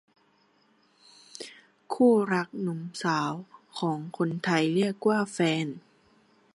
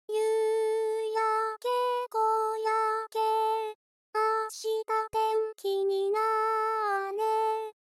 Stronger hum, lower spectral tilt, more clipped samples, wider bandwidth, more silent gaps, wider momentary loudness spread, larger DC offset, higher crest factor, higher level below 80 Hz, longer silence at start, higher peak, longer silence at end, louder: neither; first, -6 dB/octave vs -1.5 dB/octave; neither; second, 11.5 kHz vs 14.5 kHz; second, none vs 3.75-4.13 s; first, 20 LU vs 4 LU; neither; first, 20 dB vs 12 dB; about the same, -78 dBFS vs -78 dBFS; first, 1.4 s vs 0.1 s; first, -10 dBFS vs -18 dBFS; first, 0.75 s vs 0.1 s; about the same, -27 LUFS vs -29 LUFS